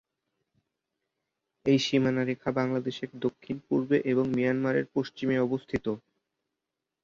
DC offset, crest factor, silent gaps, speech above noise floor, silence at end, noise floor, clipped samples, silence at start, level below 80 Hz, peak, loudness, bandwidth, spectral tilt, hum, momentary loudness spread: under 0.1%; 18 dB; none; 59 dB; 1.05 s; -87 dBFS; under 0.1%; 1.65 s; -62 dBFS; -12 dBFS; -28 LUFS; 7.4 kHz; -6.5 dB/octave; none; 8 LU